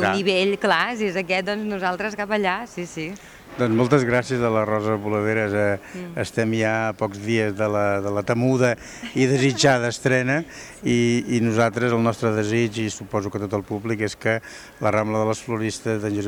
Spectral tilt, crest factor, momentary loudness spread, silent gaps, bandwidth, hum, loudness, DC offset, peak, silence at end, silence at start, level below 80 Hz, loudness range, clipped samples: -5.5 dB/octave; 16 dB; 9 LU; none; 19.5 kHz; none; -22 LUFS; under 0.1%; -6 dBFS; 0 s; 0 s; -54 dBFS; 3 LU; under 0.1%